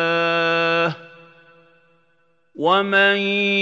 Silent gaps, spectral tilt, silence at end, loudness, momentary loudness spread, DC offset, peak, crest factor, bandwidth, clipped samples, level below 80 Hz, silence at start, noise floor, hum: none; -5.5 dB/octave; 0 s; -18 LUFS; 9 LU; under 0.1%; -4 dBFS; 18 dB; 7.8 kHz; under 0.1%; -78 dBFS; 0 s; -64 dBFS; none